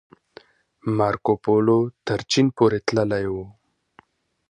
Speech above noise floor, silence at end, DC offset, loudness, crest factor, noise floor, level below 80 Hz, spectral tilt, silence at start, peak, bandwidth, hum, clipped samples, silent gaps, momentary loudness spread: 36 dB; 1 s; under 0.1%; -22 LUFS; 18 dB; -56 dBFS; -54 dBFS; -6 dB/octave; 0.85 s; -4 dBFS; 10 kHz; none; under 0.1%; none; 11 LU